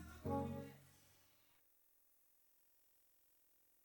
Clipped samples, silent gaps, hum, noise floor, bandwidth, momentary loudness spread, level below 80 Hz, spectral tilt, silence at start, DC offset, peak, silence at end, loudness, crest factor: under 0.1%; none; none; -75 dBFS; over 20 kHz; 24 LU; -72 dBFS; -7.5 dB/octave; 0 s; under 0.1%; -30 dBFS; 2.7 s; -47 LUFS; 22 dB